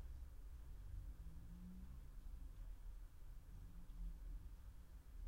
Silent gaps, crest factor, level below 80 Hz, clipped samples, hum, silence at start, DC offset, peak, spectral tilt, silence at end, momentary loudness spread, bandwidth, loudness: none; 12 dB; -54 dBFS; under 0.1%; none; 0 s; under 0.1%; -42 dBFS; -6.5 dB/octave; 0 s; 5 LU; 16 kHz; -59 LUFS